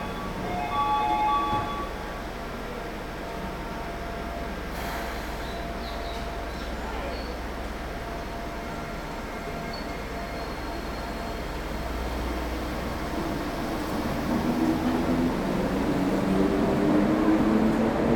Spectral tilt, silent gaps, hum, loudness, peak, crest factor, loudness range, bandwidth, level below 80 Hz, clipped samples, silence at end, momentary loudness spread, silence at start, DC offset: -6 dB/octave; none; none; -29 LUFS; -10 dBFS; 18 dB; 9 LU; over 20 kHz; -38 dBFS; under 0.1%; 0 s; 11 LU; 0 s; under 0.1%